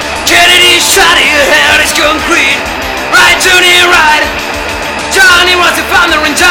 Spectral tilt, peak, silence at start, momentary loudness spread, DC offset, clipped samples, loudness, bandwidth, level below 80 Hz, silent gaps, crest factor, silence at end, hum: -1 dB/octave; 0 dBFS; 0 s; 11 LU; under 0.1%; 3%; -5 LUFS; over 20 kHz; -30 dBFS; none; 6 dB; 0 s; none